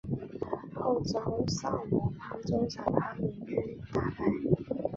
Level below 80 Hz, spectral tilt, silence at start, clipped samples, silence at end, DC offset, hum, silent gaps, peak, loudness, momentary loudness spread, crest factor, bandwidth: -52 dBFS; -7 dB/octave; 0.05 s; under 0.1%; 0 s; under 0.1%; none; none; -8 dBFS; -33 LUFS; 7 LU; 24 dB; 7.8 kHz